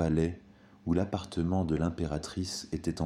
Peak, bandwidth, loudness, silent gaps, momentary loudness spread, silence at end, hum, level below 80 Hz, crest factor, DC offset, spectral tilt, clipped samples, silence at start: -16 dBFS; 12.5 kHz; -33 LUFS; none; 6 LU; 0 s; none; -46 dBFS; 16 dB; under 0.1%; -6.5 dB/octave; under 0.1%; 0 s